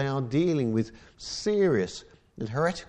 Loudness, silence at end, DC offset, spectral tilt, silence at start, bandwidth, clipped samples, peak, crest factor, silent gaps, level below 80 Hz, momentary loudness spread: -27 LUFS; 0.05 s; under 0.1%; -6 dB/octave; 0 s; 10.5 kHz; under 0.1%; -14 dBFS; 14 dB; none; -56 dBFS; 14 LU